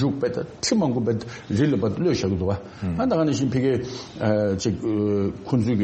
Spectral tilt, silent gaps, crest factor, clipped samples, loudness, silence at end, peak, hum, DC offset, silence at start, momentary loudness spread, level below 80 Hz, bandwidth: -6.5 dB/octave; none; 14 dB; under 0.1%; -24 LUFS; 0 s; -8 dBFS; none; under 0.1%; 0 s; 6 LU; -50 dBFS; 8.4 kHz